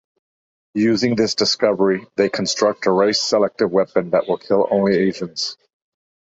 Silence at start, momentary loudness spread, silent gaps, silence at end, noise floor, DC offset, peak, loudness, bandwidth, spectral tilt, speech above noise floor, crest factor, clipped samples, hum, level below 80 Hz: 0.75 s; 5 LU; none; 0.8 s; under -90 dBFS; under 0.1%; -2 dBFS; -18 LUFS; 8 kHz; -4.5 dB/octave; over 72 dB; 16 dB; under 0.1%; none; -60 dBFS